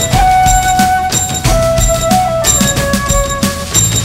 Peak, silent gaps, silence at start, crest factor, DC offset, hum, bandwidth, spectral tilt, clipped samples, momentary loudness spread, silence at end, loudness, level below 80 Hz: 0 dBFS; none; 0 s; 10 dB; under 0.1%; none; 16.5 kHz; -3 dB/octave; under 0.1%; 4 LU; 0 s; -11 LUFS; -20 dBFS